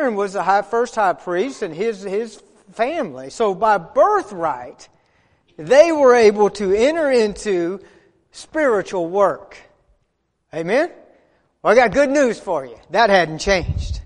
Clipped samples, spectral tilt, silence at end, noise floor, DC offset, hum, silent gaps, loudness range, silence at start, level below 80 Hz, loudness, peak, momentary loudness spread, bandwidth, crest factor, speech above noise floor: under 0.1%; -5 dB/octave; 0.05 s; -69 dBFS; under 0.1%; none; none; 6 LU; 0 s; -40 dBFS; -18 LUFS; 0 dBFS; 13 LU; 10.5 kHz; 18 dB; 51 dB